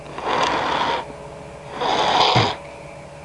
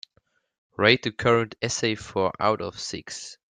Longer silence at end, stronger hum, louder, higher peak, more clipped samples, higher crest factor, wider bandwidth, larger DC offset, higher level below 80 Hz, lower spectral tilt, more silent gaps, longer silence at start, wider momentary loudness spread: second, 0 s vs 0.15 s; neither; first, -20 LUFS vs -24 LUFS; about the same, -2 dBFS vs -2 dBFS; neither; about the same, 20 dB vs 24 dB; first, 11.5 kHz vs 9.6 kHz; neither; first, -50 dBFS vs -60 dBFS; about the same, -4 dB/octave vs -4 dB/octave; neither; second, 0 s vs 0.8 s; first, 21 LU vs 14 LU